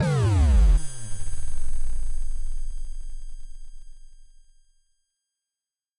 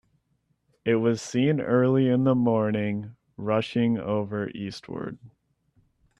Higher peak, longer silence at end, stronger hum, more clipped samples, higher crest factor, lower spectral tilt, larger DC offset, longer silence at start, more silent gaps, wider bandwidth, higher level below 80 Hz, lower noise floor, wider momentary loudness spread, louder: about the same, -10 dBFS vs -10 dBFS; first, 1.75 s vs 0.9 s; neither; neither; about the same, 12 dB vs 16 dB; about the same, -6.5 dB/octave vs -7 dB/octave; neither; second, 0 s vs 0.85 s; neither; about the same, 11 kHz vs 10.5 kHz; first, -26 dBFS vs -64 dBFS; first, under -90 dBFS vs -72 dBFS; first, 23 LU vs 14 LU; about the same, -26 LUFS vs -25 LUFS